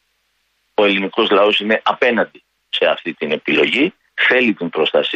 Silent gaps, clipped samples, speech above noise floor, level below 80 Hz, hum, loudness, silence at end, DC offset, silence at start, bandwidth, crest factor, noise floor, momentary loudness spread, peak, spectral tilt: none; under 0.1%; 50 dB; -64 dBFS; none; -16 LUFS; 0 s; under 0.1%; 0.8 s; 8.6 kHz; 16 dB; -66 dBFS; 8 LU; -2 dBFS; -5.5 dB/octave